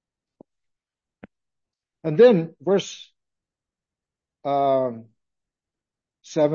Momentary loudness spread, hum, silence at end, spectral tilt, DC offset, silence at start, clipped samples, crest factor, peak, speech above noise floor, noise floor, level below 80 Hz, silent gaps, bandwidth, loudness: 19 LU; none; 0 s; -6.5 dB/octave; under 0.1%; 2.05 s; under 0.1%; 20 dB; -4 dBFS; 70 dB; -89 dBFS; -76 dBFS; none; 7.2 kHz; -21 LUFS